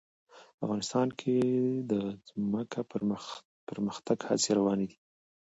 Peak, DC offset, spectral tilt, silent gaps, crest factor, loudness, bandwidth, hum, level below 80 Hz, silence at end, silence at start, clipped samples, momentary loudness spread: -14 dBFS; under 0.1%; -5 dB/octave; 0.54-0.58 s, 3.45-3.67 s; 18 dB; -32 LUFS; 8 kHz; none; -70 dBFS; 0.65 s; 0.35 s; under 0.1%; 11 LU